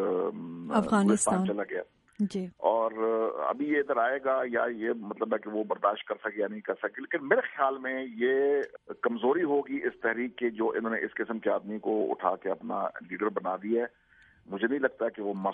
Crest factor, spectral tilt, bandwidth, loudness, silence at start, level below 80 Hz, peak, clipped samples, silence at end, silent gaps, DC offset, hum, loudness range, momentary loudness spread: 20 dB; -5 dB/octave; 11 kHz; -30 LUFS; 0 s; -72 dBFS; -10 dBFS; under 0.1%; 0 s; none; under 0.1%; none; 3 LU; 8 LU